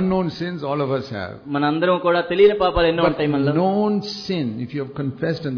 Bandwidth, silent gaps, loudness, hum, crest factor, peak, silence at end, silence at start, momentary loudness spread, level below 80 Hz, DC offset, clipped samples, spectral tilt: 5.4 kHz; none; -20 LUFS; none; 16 dB; -4 dBFS; 0 s; 0 s; 11 LU; -42 dBFS; under 0.1%; under 0.1%; -7.5 dB/octave